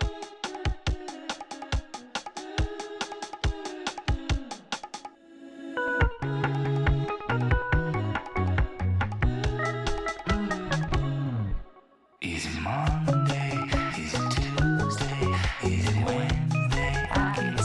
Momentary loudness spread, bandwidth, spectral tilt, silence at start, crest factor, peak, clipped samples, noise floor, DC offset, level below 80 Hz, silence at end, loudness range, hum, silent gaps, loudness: 10 LU; 11.5 kHz; -5.5 dB/octave; 0 s; 14 dB; -12 dBFS; under 0.1%; -57 dBFS; under 0.1%; -36 dBFS; 0 s; 7 LU; none; none; -29 LUFS